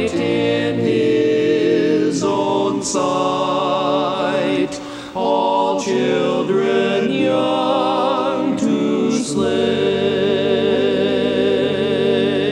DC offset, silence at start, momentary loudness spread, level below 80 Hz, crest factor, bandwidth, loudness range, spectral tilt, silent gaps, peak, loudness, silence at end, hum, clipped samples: under 0.1%; 0 s; 3 LU; -54 dBFS; 12 dB; 11 kHz; 1 LU; -5 dB/octave; none; -4 dBFS; -17 LUFS; 0 s; none; under 0.1%